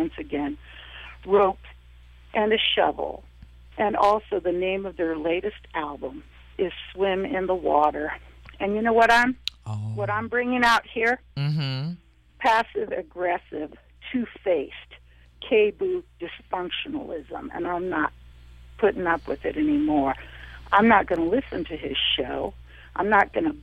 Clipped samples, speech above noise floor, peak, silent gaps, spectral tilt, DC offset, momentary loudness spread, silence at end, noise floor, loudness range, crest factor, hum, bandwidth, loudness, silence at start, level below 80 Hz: under 0.1%; 25 dB; -6 dBFS; none; -5.5 dB/octave; under 0.1%; 17 LU; 0 s; -49 dBFS; 5 LU; 20 dB; none; 14.5 kHz; -24 LUFS; 0 s; -48 dBFS